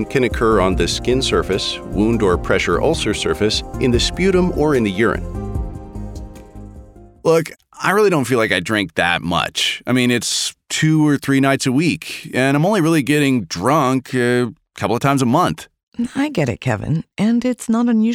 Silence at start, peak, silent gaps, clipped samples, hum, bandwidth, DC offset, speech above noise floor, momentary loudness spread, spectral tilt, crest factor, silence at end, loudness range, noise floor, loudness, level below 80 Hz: 0 s; -2 dBFS; 15.83-15.92 s; under 0.1%; none; 16.5 kHz; under 0.1%; 24 dB; 10 LU; -5 dB/octave; 16 dB; 0 s; 3 LU; -40 dBFS; -17 LUFS; -34 dBFS